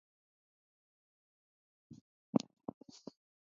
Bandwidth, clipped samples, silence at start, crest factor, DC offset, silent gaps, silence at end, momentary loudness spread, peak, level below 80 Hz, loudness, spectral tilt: 7.2 kHz; under 0.1%; 1.9 s; 30 dB; under 0.1%; 2.01-2.33 s; 1.2 s; 23 LU; -16 dBFS; -82 dBFS; -40 LUFS; -7 dB/octave